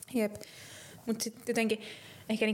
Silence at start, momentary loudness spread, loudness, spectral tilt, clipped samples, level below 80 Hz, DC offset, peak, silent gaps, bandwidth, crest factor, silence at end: 0 s; 16 LU; -34 LUFS; -4 dB/octave; under 0.1%; -72 dBFS; under 0.1%; -16 dBFS; none; 17 kHz; 18 dB; 0 s